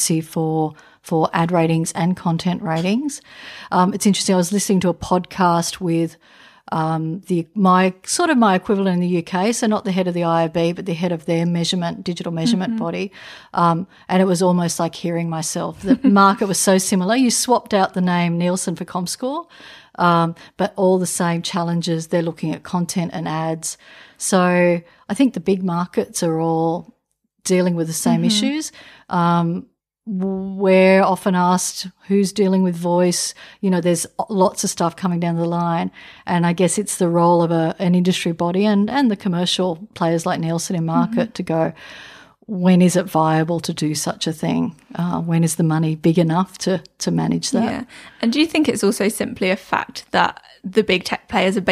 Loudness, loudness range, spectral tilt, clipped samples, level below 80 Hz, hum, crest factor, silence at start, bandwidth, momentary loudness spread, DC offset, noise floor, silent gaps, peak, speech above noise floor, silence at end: -19 LUFS; 3 LU; -5 dB/octave; under 0.1%; -56 dBFS; none; 18 dB; 0 s; 15 kHz; 9 LU; under 0.1%; -70 dBFS; none; -2 dBFS; 51 dB; 0 s